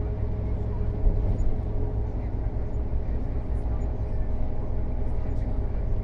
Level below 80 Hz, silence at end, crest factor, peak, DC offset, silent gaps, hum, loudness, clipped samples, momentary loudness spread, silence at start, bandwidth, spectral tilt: -28 dBFS; 0 s; 14 dB; -12 dBFS; under 0.1%; none; none; -31 LUFS; under 0.1%; 4 LU; 0 s; 3 kHz; -10.5 dB/octave